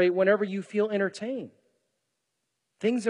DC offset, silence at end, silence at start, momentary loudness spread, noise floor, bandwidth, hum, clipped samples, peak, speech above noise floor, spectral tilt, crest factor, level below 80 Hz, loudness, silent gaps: under 0.1%; 0 s; 0 s; 13 LU; -81 dBFS; 11 kHz; none; under 0.1%; -10 dBFS; 55 dB; -6 dB/octave; 20 dB; -88 dBFS; -28 LUFS; none